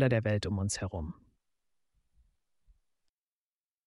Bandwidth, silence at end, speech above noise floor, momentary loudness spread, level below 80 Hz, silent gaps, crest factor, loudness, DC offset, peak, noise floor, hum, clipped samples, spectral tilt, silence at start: 11.5 kHz; 2.75 s; over 59 dB; 15 LU; -54 dBFS; none; 24 dB; -33 LUFS; under 0.1%; -12 dBFS; under -90 dBFS; none; under 0.1%; -5.5 dB/octave; 0 s